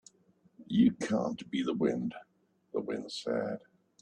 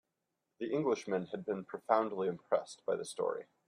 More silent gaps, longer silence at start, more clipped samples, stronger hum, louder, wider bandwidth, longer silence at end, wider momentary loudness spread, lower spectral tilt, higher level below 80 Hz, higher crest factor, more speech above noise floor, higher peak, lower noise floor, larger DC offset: neither; about the same, 0.6 s vs 0.6 s; neither; neither; first, -33 LUFS vs -36 LUFS; second, 9.8 kHz vs 11.5 kHz; first, 0.45 s vs 0.25 s; first, 12 LU vs 8 LU; about the same, -6 dB/octave vs -5.5 dB/octave; first, -70 dBFS vs -84 dBFS; about the same, 18 dB vs 22 dB; second, 36 dB vs 50 dB; about the same, -16 dBFS vs -14 dBFS; second, -67 dBFS vs -86 dBFS; neither